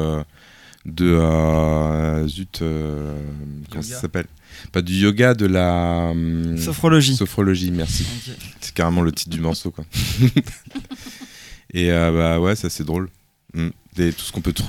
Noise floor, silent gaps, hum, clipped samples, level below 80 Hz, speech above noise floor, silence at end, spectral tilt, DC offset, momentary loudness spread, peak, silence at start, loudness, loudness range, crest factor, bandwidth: -44 dBFS; none; none; under 0.1%; -34 dBFS; 25 dB; 0 s; -6 dB/octave; under 0.1%; 17 LU; -2 dBFS; 0 s; -20 LUFS; 4 LU; 18 dB; 17 kHz